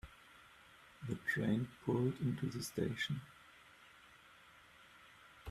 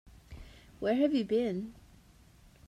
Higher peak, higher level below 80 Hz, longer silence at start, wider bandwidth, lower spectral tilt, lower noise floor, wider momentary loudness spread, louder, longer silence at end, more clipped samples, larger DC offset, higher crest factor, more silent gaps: second, -22 dBFS vs -16 dBFS; second, -68 dBFS vs -58 dBFS; second, 0.05 s vs 0.3 s; first, 15 kHz vs 13 kHz; about the same, -6 dB/octave vs -7 dB/octave; first, -63 dBFS vs -59 dBFS; about the same, 24 LU vs 24 LU; second, -40 LUFS vs -31 LUFS; second, 0 s vs 0.9 s; neither; neither; about the same, 20 dB vs 18 dB; neither